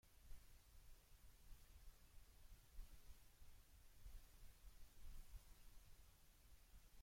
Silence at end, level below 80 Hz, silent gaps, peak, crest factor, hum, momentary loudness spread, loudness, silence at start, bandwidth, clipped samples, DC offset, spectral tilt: 0 s; -64 dBFS; none; -44 dBFS; 18 dB; none; 3 LU; -68 LUFS; 0.05 s; 16.5 kHz; under 0.1%; under 0.1%; -3.5 dB/octave